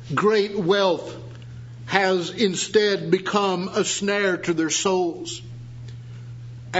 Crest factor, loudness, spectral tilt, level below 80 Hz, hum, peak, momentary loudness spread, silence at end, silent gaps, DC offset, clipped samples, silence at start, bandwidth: 22 dB; -22 LUFS; -4 dB/octave; -56 dBFS; none; 0 dBFS; 18 LU; 0 s; none; under 0.1%; under 0.1%; 0 s; 8 kHz